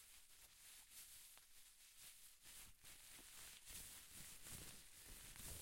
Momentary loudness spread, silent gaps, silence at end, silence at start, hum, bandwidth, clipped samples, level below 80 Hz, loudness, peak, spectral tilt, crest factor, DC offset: 8 LU; none; 0 s; 0 s; none; 16.5 kHz; under 0.1%; -72 dBFS; -59 LUFS; -42 dBFS; -1 dB/octave; 20 dB; under 0.1%